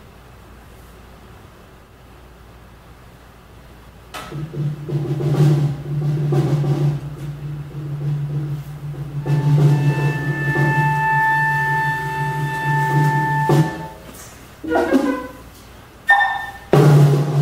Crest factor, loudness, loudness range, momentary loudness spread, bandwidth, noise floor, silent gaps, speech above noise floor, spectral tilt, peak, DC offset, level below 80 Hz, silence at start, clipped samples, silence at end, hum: 18 dB; -18 LUFS; 6 LU; 16 LU; 15.5 kHz; -44 dBFS; none; 24 dB; -7.5 dB/octave; 0 dBFS; under 0.1%; -46 dBFS; 0.05 s; under 0.1%; 0 s; none